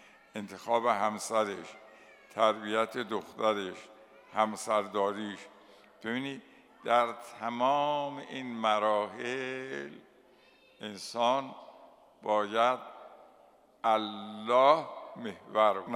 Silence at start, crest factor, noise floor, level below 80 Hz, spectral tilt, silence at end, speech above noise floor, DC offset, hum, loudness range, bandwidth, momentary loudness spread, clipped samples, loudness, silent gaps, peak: 0.35 s; 22 dB; -62 dBFS; -82 dBFS; -4 dB/octave; 0 s; 31 dB; under 0.1%; none; 4 LU; 15.5 kHz; 16 LU; under 0.1%; -31 LUFS; none; -10 dBFS